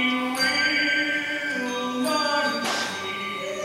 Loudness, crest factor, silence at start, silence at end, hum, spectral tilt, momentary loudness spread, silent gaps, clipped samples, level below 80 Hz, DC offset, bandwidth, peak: -24 LUFS; 16 dB; 0 s; 0 s; none; -2 dB/octave; 8 LU; none; under 0.1%; -68 dBFS; under 0.1%; 16 kHz; -10 dBFS